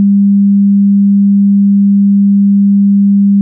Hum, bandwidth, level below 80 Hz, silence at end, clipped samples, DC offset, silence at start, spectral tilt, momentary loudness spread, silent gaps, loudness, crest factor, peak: none; 0.3 kHz; -74 dBFS; 0 s; under 0.1%; under 0.1%; 0 s; -18 dB/octave; 0 LU; none; -8 LUFS; 4 dB; -4 dBFS